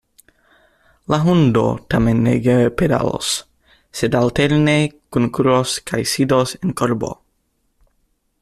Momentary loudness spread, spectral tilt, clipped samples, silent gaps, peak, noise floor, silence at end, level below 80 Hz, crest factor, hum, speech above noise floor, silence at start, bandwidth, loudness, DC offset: 8 LU; -5.5 dB/octave; under 0.1%; none; -2 dBFS; -66 dBFS; 1.3 s; -42 dBFS; 16 dB; none; 50 dB; 1.1 s; 14.5 kHz; -17 LUFS; under 0.1%